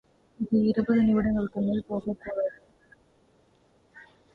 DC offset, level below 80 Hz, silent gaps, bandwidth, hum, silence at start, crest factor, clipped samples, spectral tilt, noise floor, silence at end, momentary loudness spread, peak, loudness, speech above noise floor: under 0.1%; -54 dBFS; none; 4.7 kHz; none; 0.4 s; 16 dB; under 0.1%; -10 dB/octave; -64 dBFS; 0.3 s; 10 LU; -12 dBFS; -27 LUFS; 38 dB